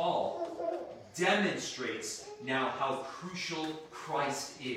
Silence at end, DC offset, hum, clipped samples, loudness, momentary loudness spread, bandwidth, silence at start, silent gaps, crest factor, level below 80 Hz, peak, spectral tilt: 0 s; under 0.1%; none; under 0.1%; -35 LUFS; 11 LU; 16.5 kHz; 0 s; none; 20 dB; -74 dBFS; -14 dBFS; -3.5 dB/octave